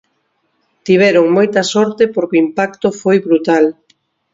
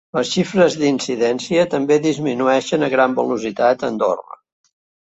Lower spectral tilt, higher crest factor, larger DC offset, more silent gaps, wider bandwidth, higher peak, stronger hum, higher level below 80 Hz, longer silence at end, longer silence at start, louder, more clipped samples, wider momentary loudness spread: about the same, -5.5 dB/octave vs -5 dB/octave; about the same, 14 dB vs 16 dB; neither; neither; about the same, 7.8 kHz vs 8.2 kHz; about the same, 0 dBFS vs -2 dBFS; neither; about the same, -58 dBFS vs -60 dBFS; second, 0.6 s vs 0.85 s; first, 0.85 s vs 0.15 s; first, -13 LUFS vs -18 LUFS; neither; about the same, 7 LU vs 5 LU